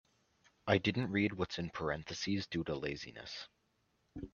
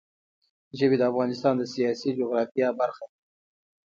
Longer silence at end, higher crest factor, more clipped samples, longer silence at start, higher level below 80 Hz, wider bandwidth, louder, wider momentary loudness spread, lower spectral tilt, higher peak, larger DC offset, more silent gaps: second, 0.05 s vs 0.8 s; first, 26 dB vs 18 dB; neither; about the same, 0.65 s vs 0.75 s; first, -64 dBFS vs -72 dBFS; about the same, 7.2 kHz vs 7.6 kHz; second, -37 LUFS vs -26 LUFS; first, 15 LU vs 12 LU; about the same, -5.5 dB/octave vs -6.5 dB/octave; second, -14 dBFS vs -10 dBFS; neither; second, none vs 2.51-2.55 s